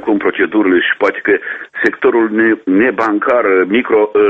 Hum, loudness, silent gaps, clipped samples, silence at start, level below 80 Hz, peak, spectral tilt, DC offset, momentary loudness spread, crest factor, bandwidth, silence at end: none; -13 LUFS; none; under 0.1%; 0 s; -54 dBFS; 0 dBFS; -6.5 dB/octave; under 0.1%; 4 LU; 12 dB; 7.2 kHz; 0 s